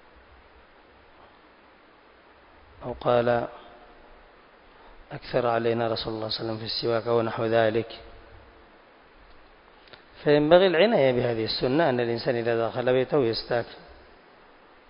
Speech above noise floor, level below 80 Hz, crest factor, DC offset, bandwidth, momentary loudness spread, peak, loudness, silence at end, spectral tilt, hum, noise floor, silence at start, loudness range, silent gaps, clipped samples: 31 dB; -56 dBFS; 24 dB; under 0.1%; 5.4 kHz; 18 LU; -4 dBFS; -24 LUFS; 0.95 s; -10 dB/octave; none; -55 dBFS; 2.8 s; 8 LU; none; under 0.1%